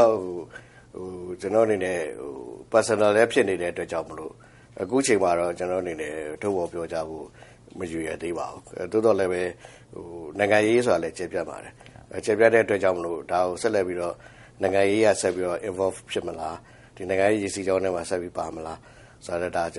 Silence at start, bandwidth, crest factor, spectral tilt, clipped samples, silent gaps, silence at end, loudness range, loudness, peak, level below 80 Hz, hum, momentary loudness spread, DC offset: 0 s; 11.5 kHz; 22 dB; -4.5 dB/octave; under 0.1%; none; 0 s; 5 LU; -25 LUFS; -4 dBFS; -58 dBFS; none; 19 LU; under 0.1%